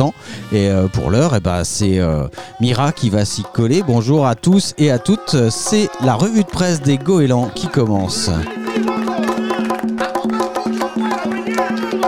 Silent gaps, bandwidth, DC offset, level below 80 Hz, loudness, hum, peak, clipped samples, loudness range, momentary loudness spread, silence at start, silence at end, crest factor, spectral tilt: none; 15.5 kHz; under 0.1%; -38 dBFS; -17 LUFS; none; -2 dBFS; under 0.1%; 4 LU; 5 LU; 0 s; 0 s; 14 dB; -5.5 dB/octave